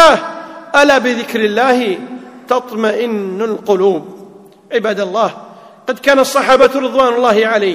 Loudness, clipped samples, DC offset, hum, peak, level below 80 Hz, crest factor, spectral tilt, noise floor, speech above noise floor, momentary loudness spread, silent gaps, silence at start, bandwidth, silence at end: -13 LUFS; 0.7%; under 0.1%; none; 0 dBFS; -52 dBFS; 14 dB; -4 dB/octave; -38 dBFS; 26 dB; 14 LU; none; 0 s; 16 kHz; 0 s